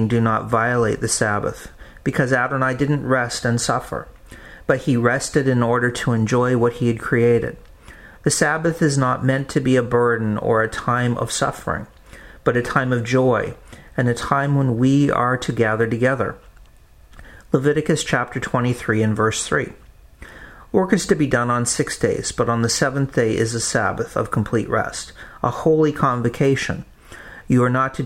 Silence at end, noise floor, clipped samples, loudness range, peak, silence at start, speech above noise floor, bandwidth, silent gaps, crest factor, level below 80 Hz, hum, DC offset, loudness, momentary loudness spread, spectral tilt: 0 s; -47 dBFS; under 0.1%; 2 LU; 0 dBFS; 0 s; 28 dB; 15 kHz; none; 20 dB; -44 dBFS; none; under 0.1%; -19 LUFS; 9 LU; -5.5 dB/octave